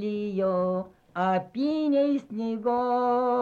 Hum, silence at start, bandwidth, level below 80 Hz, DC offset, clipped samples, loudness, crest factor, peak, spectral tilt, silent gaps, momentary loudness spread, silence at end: none; 0 s; 7.2 kHz; -66 dBFS; under 0.1%; under 0.1%; -27 LUFS; 12 dB; -14 dBFS; -8.5 dB/octave; none; 6 LU; 0 s